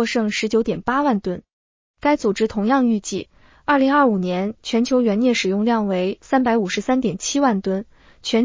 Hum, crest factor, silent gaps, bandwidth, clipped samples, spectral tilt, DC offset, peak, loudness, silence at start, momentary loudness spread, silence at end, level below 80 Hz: none; 16 dB; 1.53-1.94 s; 7.6 kHz; under 0.1%; -5 dB/octave; under 0.1%; -4 dBFS; -20 LUFS; 0 s; 8 LU; 0 s; -52 dBFS